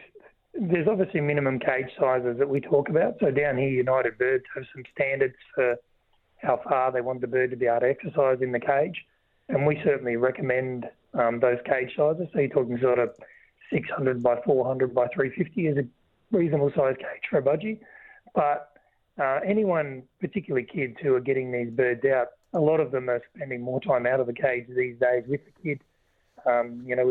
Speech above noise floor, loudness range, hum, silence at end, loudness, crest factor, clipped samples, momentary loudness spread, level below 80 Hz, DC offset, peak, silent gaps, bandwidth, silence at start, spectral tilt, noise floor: 41 dB; 3 LU; none; 0 s; -26 LUFS; 18 dB; under 0.1%; 9 LU; -64 dBFS; under 0.1%; -8 dBFS; none; 4.1 kHz; 0 s; -10 dB/octave; -66 dBFS